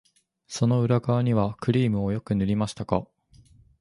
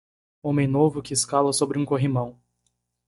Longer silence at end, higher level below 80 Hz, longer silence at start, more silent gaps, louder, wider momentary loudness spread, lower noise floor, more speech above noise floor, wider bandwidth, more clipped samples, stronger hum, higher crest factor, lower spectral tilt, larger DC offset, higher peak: about the same, 0.75 s vs 0.75 s; first, -50 dBFS vs -58 dBFS; about the same, 0.5 s vs 0.45 s; neither; about the same, -25 LUFS vs -23 LUFS; about the same, 6 LU vs 7 LU; second, -56 dBFS vs -74 dBFS; second, 32 dB vs 52 dB; about the same, 11.5 kHz vs 11.5 kHz; neither; second, none vs 60 Hz at -40 dBFS; about the same, 20 dB vs 18 dB; first, -7.5 dB/octave vs -5.5 dB/octave; neither; about the same, -6 dBFS vs -6 dBFS